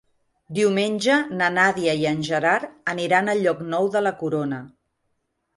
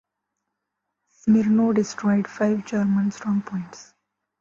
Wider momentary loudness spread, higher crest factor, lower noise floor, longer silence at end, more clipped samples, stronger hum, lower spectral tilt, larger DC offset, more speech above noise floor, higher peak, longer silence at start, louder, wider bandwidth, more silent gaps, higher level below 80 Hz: second, 7 LU vs 11 LU; about the same, 18 dB vs 14 dB; second, -73 dBFS vs -81 dBFS; first, 0.9 s vs 0.6 s; neither; second, none vs 50 Hz at -35 dBFS; second, -5 dB/octave vs -7 dB/octave; neither; second, 52 dB vs 59 dB; first, -6 dBFS vs -10 dBFS; second, 0.5 s vs 1.25 s; about the same, -22 LUFS vs -22 LUFS; first, 11.5 kHz vs 7.4 kHz; neither; about the same, -66 dBFS vs -62 dBFS